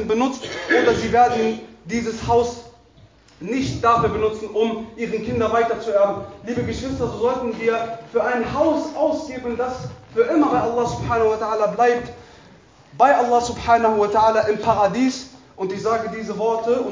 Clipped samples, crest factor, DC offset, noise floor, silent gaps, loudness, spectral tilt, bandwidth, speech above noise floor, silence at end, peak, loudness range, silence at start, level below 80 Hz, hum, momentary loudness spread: under 0.1%; 18 dB; under 0.1%; -50 dBFS; none; -20 LUFS; -5.5 dB/octave; 7.6 kHz; 31 dB; 0 s; -2 dBFS; 4 LU; 0 s; -44 dBFS; none; 11 LU